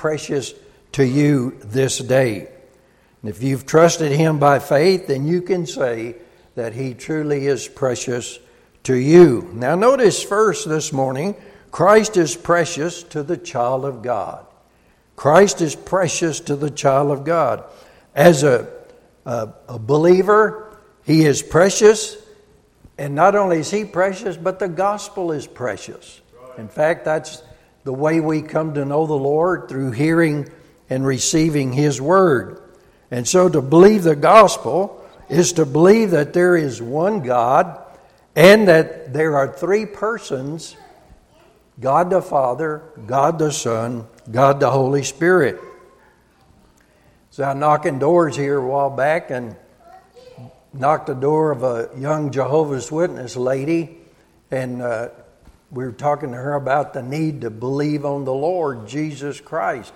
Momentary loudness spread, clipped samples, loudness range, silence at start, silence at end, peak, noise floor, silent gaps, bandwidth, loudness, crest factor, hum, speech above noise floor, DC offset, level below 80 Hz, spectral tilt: 15 LU; under 0.1%; 8 LU; 0 s; 0.05 s; 0 dBFS; -55 dBFS; none; 16 kHz; -17 LUFS; 18 dB; none; 39 dB; under 0.1%; -54 dBFS; -5.5 dB/octave